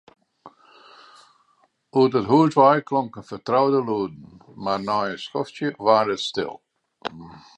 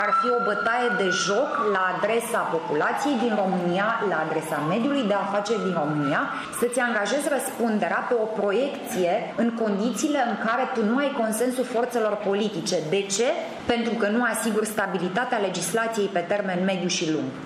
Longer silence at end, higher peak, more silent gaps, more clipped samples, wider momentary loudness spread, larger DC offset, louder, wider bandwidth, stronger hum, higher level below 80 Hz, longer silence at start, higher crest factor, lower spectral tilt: first, 0.2 s vs 0 s; first, -2 dBFS vs -8 dBFS; neither; neither; first, 17 LU vs 3 LU; neither; first, -21 LUFS vs -24 LUFS; second, 9 kHz vs 15.5 kHz; neither; about the same, -64 dBFS vs -66 dBFS; first, 0.45 s vs 0 s; about the same, 20 dB vs 16 dB; first, -6.5 dB/octave vs -4 dB/octave